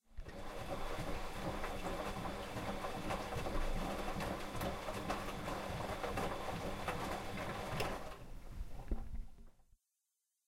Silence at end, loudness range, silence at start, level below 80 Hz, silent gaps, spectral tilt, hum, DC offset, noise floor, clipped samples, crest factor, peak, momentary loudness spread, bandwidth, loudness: 0.85 s; 3 LU; 0.1 s; -48 dBFS; none; -5 dB/octave; none; under 0.1%; -87 dBFS; under 0.1%; 16 dB; -26 dBFS; 11 LU; 16 kHz; -43 LUFS